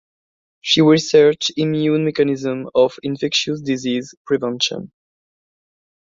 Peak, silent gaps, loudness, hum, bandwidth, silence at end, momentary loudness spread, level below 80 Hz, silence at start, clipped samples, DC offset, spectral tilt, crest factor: -2 dBFS; 4.17-4.25 s; -17 LUFS; none; 7.6 kHz; 1.3 s; 10 LU; -60 dBFS; 0.65 s; under 0.1%; under 0.1%; -5 dB/octave; 18 dB